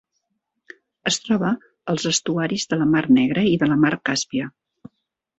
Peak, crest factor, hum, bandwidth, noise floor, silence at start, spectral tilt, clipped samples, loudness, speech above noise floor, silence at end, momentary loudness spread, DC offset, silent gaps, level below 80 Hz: -4 dBFS; 16 dB; none; 8.2 kHz; -75 dBFS; 1.05 s; -4.5 dB/octave; under 0.1%; -20 LUFS; 56 dB; 0.9 s; 11 LU; under 0.1%; none; -58 dBFS